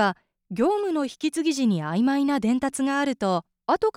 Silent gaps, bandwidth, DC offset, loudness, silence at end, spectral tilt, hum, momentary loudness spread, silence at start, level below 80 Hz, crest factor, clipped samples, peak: none; 15 kHz; under 0.1%; -24 LUFS; 0.05 s; -5.5 dB/octave; none; 4 LU; 0 s; -62 dBFS; 14 dB; under 0.1%; -10 dBFS